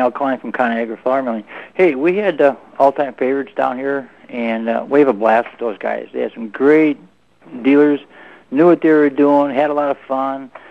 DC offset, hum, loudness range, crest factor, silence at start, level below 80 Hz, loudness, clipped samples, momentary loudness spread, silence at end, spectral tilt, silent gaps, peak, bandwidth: 0.2%; none; 3 LU; 16 dB; 0 s; -68 dBFS; -16 LUFS; under 0.1%; 12 LU; 0.15 s; -8 dB/octave; none; 0 dBFS; 5.8 kHz